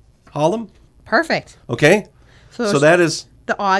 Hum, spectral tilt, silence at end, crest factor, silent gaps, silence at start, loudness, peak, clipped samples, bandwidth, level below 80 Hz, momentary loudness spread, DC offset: none; -5 dB/octave; 0 s; 18 dB; none; 0.35 s; -17 LUFS; 0 dBFS; under 0.1%; 11 kHz; -52 dBFS; 14 LU; under 0.1%